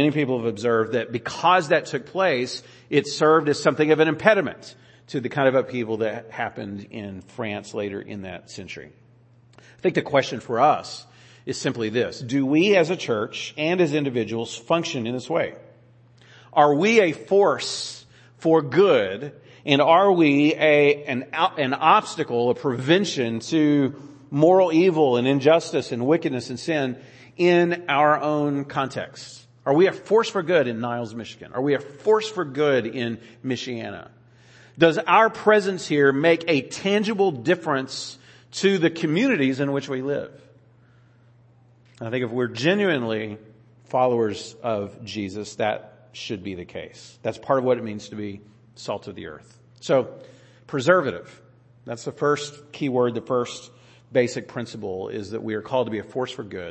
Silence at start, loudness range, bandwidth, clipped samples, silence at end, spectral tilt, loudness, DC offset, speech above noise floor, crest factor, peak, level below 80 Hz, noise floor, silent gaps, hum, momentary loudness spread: 0 s; 8 LU; 8.8 kHz; under 0.1%; 0 s; -5.5 dB/octave; -22 LUFS; under 0.1%; 33 dB; 22 dB; 0 dBFS; -68 dBFS; -55 dBFS; none; none; 17 LU